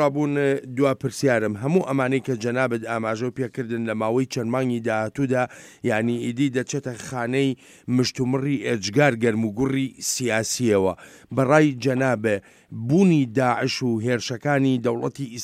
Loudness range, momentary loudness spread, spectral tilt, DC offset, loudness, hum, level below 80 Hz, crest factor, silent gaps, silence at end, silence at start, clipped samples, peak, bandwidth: 4 LU; 9 LU; -5.5 dB/octave; under 0.1%; -23 LUFS; none; -60 dBFS; 18 dB; none; 0 s; 0 s; under 0.1%; -4 dBFS; 16 kHz